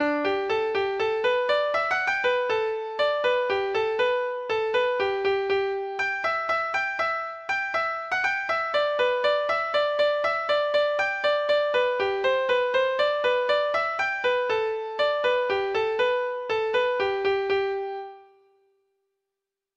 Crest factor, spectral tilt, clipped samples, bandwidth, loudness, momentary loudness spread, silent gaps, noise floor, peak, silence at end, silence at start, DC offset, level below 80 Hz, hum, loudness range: 12 dB; -3.5 dB/octave; under 0.1%; 8.4 kHz; -25 LUFS; 4 LU; none; -86 dBFS; -12 dBFS; 1.55 s; 0 s; under 0.1%; -64 dBFS; none; 2 LU